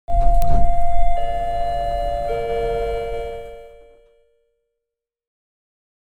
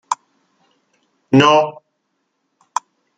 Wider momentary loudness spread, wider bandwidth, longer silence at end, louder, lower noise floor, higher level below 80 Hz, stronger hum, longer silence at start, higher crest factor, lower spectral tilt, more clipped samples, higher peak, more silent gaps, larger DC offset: second, 10 LU vs 16 LU; second, 4.4 kHz vs 9.4 kHz; first, 2.4 s vs 1.45 s; second, -23 LUFS vs -16 LUFS; first, -84 dBFS vs -71 dBFS; first, -24 dBFS vs -62 dBFS; neither; about the same, 0.1 s vs 0.1 s; about the same, 16 dB vs 18 dB; first, -6.5 dB/octave vs -5 dB/octave; neither; about the same, -2 dBFS vs -2 dBFS; neither; neither